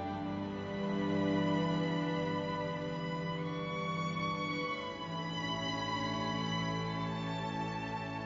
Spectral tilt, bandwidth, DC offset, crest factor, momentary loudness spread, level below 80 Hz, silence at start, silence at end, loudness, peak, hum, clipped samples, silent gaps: -4.5 dB/octave; 7.6 kHz; under 0.1%; 14 dB; 6 LU; -62 dBFS; 0 s; 0 s; -36 LUFS; -22 dBFS; none; under 0.1%; none